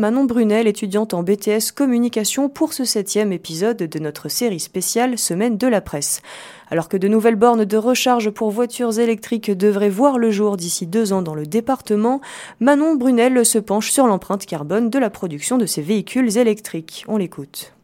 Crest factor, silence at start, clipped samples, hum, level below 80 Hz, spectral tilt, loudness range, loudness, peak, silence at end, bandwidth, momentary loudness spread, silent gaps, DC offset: 18 dB; 0 s; under 0.1%; none; -58 dBFS; -4.5 dB/octave; 3 LU; -18 LUFS; 0 dBFS; 0.15 s; 17 kHz; 9 LU; none; under 0.1%